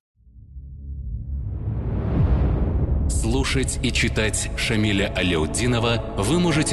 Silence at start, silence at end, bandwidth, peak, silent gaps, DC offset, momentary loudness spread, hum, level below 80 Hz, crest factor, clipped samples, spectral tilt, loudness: 0.35 s; 0 s; 12.5 kHz; -8 dBFS; none; under 0.1%; 12 LU; none; -28 dBFS; 14 dB; under 0.1%; -5 dB/octave; -22 LUFS